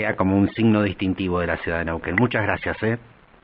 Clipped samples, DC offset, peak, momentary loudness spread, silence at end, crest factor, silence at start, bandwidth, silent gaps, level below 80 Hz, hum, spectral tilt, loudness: under 0.1%; under 0.1%; -4 dBFS; 6 LU; 0.45 s; 18 dB; 0 s; 5.2 kHz; none; -44 dBFS; none; -11 dB/octave; -22 LUFS